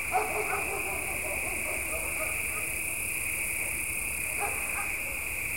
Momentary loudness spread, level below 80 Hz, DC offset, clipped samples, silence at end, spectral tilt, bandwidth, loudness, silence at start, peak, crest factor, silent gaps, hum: 1 LU; -48 dBFS; 0.4%; under 0.1%; 0 s; -2 dB/octave; 16.5 kHz; -30 LUFS; 0 s; -16 dBFS; 16 dB; none; none